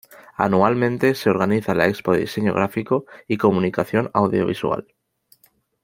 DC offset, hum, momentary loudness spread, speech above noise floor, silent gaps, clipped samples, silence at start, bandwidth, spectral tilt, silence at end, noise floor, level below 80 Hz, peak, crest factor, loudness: under 0.1%; none; 6 LU; 41 dB; none; under 0.1%; 0.4 s; 16.5 kHz; -7 dB/octave; 1 s; -60 dBFS; -58 dBFS; -2 dBFS; 18 dB; -20 LUFS